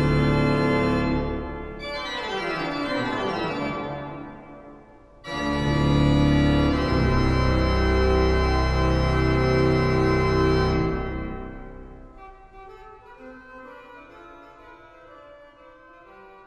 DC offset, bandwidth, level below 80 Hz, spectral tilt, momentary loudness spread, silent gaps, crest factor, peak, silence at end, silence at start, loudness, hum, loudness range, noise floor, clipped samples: under 0.1%; 11.5 kHz; -30 dBFS; -7 dB/octave; 22 LU; none; 16 dB; -8 dBFS; 0.2 s; 0 s; -23 LUFS; none; 9 LU; -49 dBFS; under 0.1%